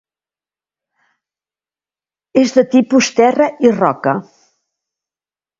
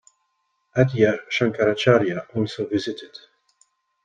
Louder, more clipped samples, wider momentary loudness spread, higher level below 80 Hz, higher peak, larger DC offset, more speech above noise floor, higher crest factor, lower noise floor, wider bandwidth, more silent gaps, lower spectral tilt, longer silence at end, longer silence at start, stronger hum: first, -13 LUFS vs -21 LUFS; neither; second, 7 LU vs 11 LU; about the same, -62 dBFS vs -58 dBFS; about the same, 0 dBFS vs -2 dBFS; neither; first, over 78 dB vs 51 dB; about the same, 16 dB vs 20 dB; first, under -90 dBFS vs -72 dBFS; second, 7.6 kHz vs 9.2 kHz; neither; second, -5 dB/octave vs -6.5 dB/octave; first, 1.4 s vs 0.9 s; first, 2.35 s vs 0.75 s; neither